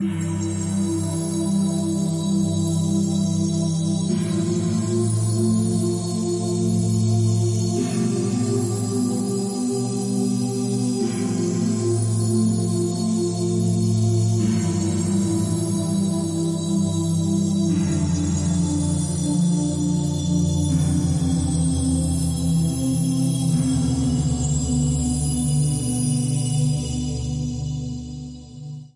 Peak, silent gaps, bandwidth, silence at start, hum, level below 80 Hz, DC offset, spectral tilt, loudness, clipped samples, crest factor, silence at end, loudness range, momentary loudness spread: -10 dBFS; none; 11.5 kHz; 0 s; none; -40 dBFS; under 0.1%; -6.5 dB/octave; -22 LUFS; under 0.1%; 12 dB; 0.1 s; 2 LU; 4 LU